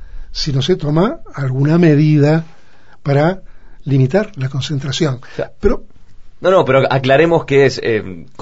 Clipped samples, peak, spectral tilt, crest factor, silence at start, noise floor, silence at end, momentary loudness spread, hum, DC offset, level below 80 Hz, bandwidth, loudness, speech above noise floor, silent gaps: under 0.1%; 0 dBFS; -7 dB/octave; 14 dB; 0 s; -48 dBFS; 0.2 s; 13 LU; none; 2%; -32 dBFS; 8 kHz; -15 LUFS; 34 dB; none